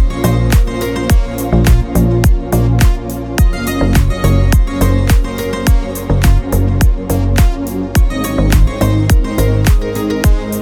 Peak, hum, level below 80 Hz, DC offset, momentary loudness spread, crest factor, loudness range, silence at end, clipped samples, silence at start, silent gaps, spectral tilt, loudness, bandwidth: 0 dBFS; none; -14 dBFS; under 0.1%; 4 LU; 10 dB; 1 LU; 0 s; under 0.1%; 0 s; none; -6 dB/octave; -13 LUFS; 18.5 kHz